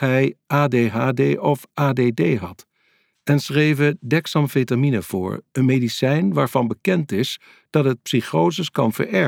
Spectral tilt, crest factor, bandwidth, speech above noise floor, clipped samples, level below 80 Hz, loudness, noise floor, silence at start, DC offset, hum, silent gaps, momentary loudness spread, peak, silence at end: -6.5 dB/octave; 16 dB; 17 kHz; 44 dB; under 0.1%; -62 dBFS; -20 LUFS; -64 dBFS; 0 s; under 0.1%; none; none; 5 LU; -4 dBFS; 0 s